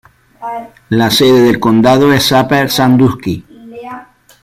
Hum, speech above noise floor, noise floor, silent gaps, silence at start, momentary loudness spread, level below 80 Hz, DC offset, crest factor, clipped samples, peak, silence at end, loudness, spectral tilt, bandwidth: none; 23 dB; -33 dBFS; none; 0.4 s; 20 LU; -44 dBFS; under 0.1%; 10 dB; under 0.1%; 0 dBFS; 0.4 s; -10 LUFS; -5 dB/octave; 16 kHz